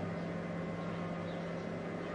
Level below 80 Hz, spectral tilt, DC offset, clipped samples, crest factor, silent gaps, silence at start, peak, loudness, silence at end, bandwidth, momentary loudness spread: -66 dBFS; -7.5 dB/octave; under 0.1%; under 0.1%; 12 dB; none; 0 s; -28 dBFS; -40 LUFS; 0 s; 9.6 kHz; 1 LU